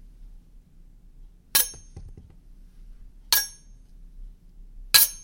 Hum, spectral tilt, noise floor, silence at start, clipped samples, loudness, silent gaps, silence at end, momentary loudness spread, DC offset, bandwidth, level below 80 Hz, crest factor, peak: none; 1.5 dB/octave; -50 dBFS; 1.55 s; under 0.1%; -21 LUFS; none; 0.05 s; 16 LU; under 0.1%; 17 kHz; -46 dBFS; 30 dB; 0 dBFS